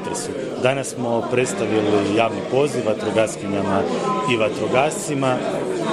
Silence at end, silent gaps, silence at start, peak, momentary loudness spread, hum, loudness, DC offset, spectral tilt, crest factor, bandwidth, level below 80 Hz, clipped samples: 0 s; none; 0 s; -2 dBFS; 5 LU; none; -21 LUFS; under 0.1%; -5 dB/octave; 18 dB; 14 kHz; -58 dBFS; under 0.1%